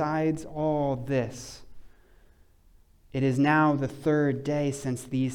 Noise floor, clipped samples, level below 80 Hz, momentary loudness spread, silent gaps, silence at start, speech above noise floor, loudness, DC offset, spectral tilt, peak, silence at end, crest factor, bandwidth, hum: -58 dBFS; under 0.1%; -56 dBFS; 14 LU; none; 0 s; 31 dB; -27 LUFS; under 0.1%; -7 dB/octave; -12 dBFS; 0 s; 16 dB; 14 kHz; none